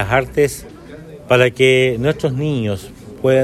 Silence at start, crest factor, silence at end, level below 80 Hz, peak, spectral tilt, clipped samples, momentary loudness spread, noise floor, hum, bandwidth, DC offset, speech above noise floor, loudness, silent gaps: 0 s; 16 dB; 0 s; -42 dBFS; 0 dBFS; -5.5 dB/octave; under 0.1%; 24 LU; -36 dBFS; none; 14 kHz; under 0.1%; 20 dB; -16 LUFS; none